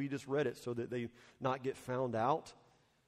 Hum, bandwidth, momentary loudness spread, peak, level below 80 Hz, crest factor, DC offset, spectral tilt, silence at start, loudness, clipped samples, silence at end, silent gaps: none; 15.5 kHz; 8 LU; -20 dBFS; -74 dBFS; 20 dB; under 0.1%; -6.5 dB/octave; 0 s; -39 LUFS; under 0.1%; 0.55 s; none